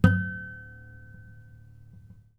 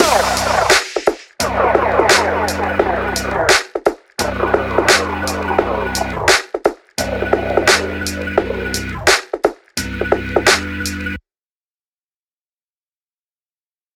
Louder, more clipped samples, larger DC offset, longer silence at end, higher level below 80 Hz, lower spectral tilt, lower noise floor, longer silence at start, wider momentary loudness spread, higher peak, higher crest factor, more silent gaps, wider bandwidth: second, -30 LUFS vs -16 LUFS; neither; neither; second, 1 s vs 2.75 s; second, -46 dBFS vs -34 dBFS; first, -8.5 dB/octave vs -3 dB/octave; second, -51 dBFS vs under -90 dBFS; about the same, 0 s vs 0 s; first, 23 LU vs 9 LU; second, -4 dBFS vs 0 dBFS; first, 26 dB vs 18 dB; neither; second, 8.4 kHz vs 19 kHz